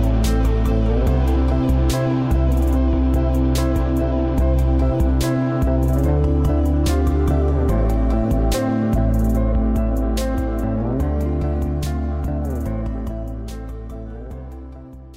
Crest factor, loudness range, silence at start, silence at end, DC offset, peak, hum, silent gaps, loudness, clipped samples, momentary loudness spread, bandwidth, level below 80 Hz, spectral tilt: 10 dB; 6 LU; 0 s; 0 s; 0.1%; -8 dBFS; none; none; -20 LUFS; under 0.1%; 12 LU; 15.5 kHz; -20 dBFS; -7.5 dB/octave